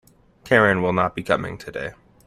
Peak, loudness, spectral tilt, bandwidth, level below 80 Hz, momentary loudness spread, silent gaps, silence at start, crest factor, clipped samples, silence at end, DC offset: -2 dBFS; -21 LUFS; -6.5 dB/octave; 15 kHz; -52 dBFS; 15 LU; none; 0.45 s; 20 dB; under 0.1%; 0.35 s; under 0.1%